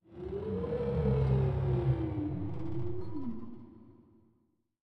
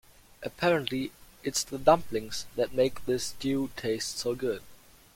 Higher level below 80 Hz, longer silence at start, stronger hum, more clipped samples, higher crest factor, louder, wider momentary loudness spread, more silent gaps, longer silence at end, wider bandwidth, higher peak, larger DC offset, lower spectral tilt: first, -44 dBFS vs -56 dBFS; second, 0 s vs 0.4 s; neither; neither; second, 16 dB vs 24 dB; second, -34 LUFS vs -30 LUFS; about the same, 12 LU vs 13 LU; neither; second, 0 s vs 0.4 s; second, 4.7 kHz vs 16.5 kHz; second, -18 dBFS vs -6 dBFS; neither; first, -11 dB/octave vs -4 dB/octave